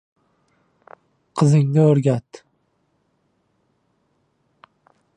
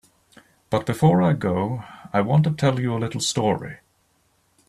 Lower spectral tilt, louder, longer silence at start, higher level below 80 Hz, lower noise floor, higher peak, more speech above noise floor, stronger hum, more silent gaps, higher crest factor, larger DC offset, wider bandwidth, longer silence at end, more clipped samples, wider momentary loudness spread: first, -8.5 dB/octave vs -6 dB/octave; first, -18 LUFS vs -22 LUFS; first, 1.35 s vs 0.7 s; second, -66 dBFS vs -56 dBFS; about the same, -67 dBFS vs -65 dBFS; about the same, -4 dBFS vs -6 dBFS; first, 51 dB vs 44 dB; neither; neither; about the same, 20 dB vs 16 dB; neither; second, 10 kHz vs 13.5 kHz; first, 2.95 s vs 0.9 s; neither; about the same, 11 LU vs 10 LU